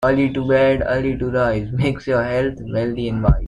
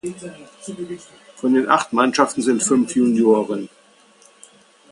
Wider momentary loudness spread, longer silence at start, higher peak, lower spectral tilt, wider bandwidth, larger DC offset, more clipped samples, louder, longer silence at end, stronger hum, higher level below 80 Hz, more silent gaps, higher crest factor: second, 6 LU vs 20 LU; about the same, 0 s vs 0.05 s; about the same, -2 dBFS vs 0 dBFS; first, -8.5 dB/octave vs -4 dB/octave; about the same, 10.5 kHz vs 11.5 kHz; neither; neither; about the same, -19 LUFS vs -18 LUFS; second, 0 s vs 1.25 s; neither; first, -30 dBFS vs -66 dBFS; neither; about the same, 16 dB vs 20 dB